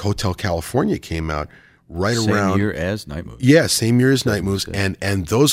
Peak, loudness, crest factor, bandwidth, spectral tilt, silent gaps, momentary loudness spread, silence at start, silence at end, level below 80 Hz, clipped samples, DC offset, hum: -2 dBFS; -19 LUFS; 16 dB; 16 kHz; -5 dB/octave; none; 11 LU; 0 s; 0 s; -40 dBFS; under 0.1%; under 0.1%; none